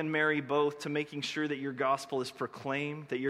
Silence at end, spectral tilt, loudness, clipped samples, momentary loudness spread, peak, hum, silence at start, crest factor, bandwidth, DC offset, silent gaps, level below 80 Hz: 0 s; -5 dB/octave; -33 LUFS; under 0.1%; 7 LU; -16 dBFS; none; 0 s; 16 dB; 14 kHz; under 0.1%; none; -78 dBFS